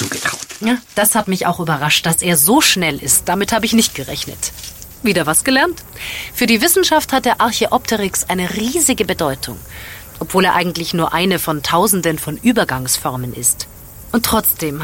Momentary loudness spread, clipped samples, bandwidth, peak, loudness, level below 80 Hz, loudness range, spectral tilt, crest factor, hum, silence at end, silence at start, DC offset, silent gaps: 12 LU; under 0.1%; 17 kHz; 0 dBFS; -15 LUFS; -42 dBFS; 3 LU; -3 dB/octave; 16 dB; none; 0 s; 0 s; under 0.1%; none